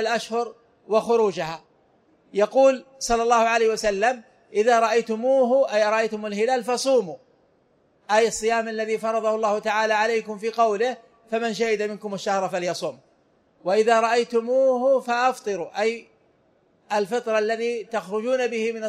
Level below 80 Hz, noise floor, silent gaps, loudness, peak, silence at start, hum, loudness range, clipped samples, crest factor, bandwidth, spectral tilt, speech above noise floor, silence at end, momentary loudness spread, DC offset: -58 dBFS; -63 dBFS; none; -23 LUFS; -6 dBFS; 0 s; none; 5 LU; under 0.1%; 16 dB; 13.5 kHz; -3.5 dB/octave; 41 dB; 0 s; 10 LU; under 0.1%